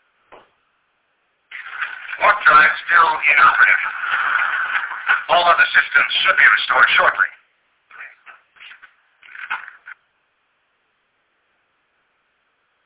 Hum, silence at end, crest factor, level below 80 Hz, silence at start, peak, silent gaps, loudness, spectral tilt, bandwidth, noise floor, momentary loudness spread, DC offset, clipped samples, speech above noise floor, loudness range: none; 2.9 s; 16 dB; -62 dBFS; 1.5 s; -4 dBFS; none; -14 LUFS; -4 dB/octave; 4 kHz; -67 dBFS; 17 LU; under 0.1%; under 0.1%; 52 dB; 22 LU